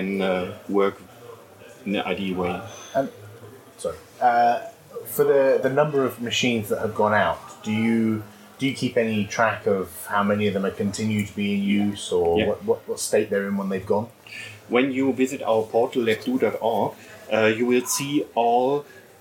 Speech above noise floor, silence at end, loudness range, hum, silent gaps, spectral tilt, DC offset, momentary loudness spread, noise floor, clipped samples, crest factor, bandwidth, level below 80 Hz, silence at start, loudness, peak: 23 dB; 0.2 s; 4 LU; none; none; -5 dB/octave; under 0.1%; 12 LU; -46 dBFS; under 0.1%; 18 dB; 17 kHz; -60 dBFS; 0 s; -23 LUFS; -4 dBFS